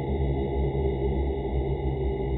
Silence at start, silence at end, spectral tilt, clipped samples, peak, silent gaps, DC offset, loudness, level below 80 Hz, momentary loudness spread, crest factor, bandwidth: 0 s; 0 s; -12.5 dB/octave; under 0.1%; -16 dBFS; none; under 0.1%; -28 LUFS; -30 dBFS; 2 LU; 12 dB; 4.1 kHz